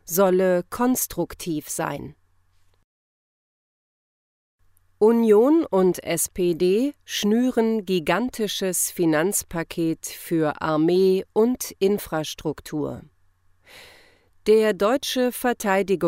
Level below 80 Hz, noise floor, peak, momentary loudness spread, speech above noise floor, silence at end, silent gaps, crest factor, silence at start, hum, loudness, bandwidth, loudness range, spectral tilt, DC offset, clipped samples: -54 dBFS; -60 dBFS; -6 dBFS; 11 LU; 39 dB; 0 s; 2.84-4.59 s; 16 dB; 0.05 s; none; -22 LUFS; 16 kHz; 8 LU; -4.5 dB/octave; under 0.1%; under 0.1%